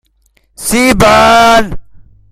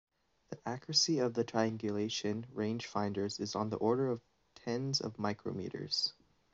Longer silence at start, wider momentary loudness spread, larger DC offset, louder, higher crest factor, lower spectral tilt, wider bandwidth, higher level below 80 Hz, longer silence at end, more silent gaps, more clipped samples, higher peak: about the same, 0.6 s vs 0.5 s; about the same, 13 LU vs 11 LU; neither; first, -7 LUFS vs -35 LUFS; second, 10 dB vs 20 dB; about the same, -3.5 dB/octave vs -4 dB/octave; first, 16.5 kHz vs 8 kHz; first, -28 dBFS vs -74 dBFS; about the same, 0.5 s vs 0.4 s; neither; first, 0.3% vs under 0.1%; first, 0 dBFS vs -16 dBFS